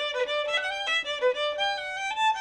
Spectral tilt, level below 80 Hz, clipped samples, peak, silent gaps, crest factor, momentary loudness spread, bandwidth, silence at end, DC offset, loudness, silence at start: 1 dB/octave; -64 dBFS; under 0.1%; -14 dBFS; none; 14 dB; 2 LU; 11 kHz; 0 s; under 0.1%; -27 LUFS; 0 s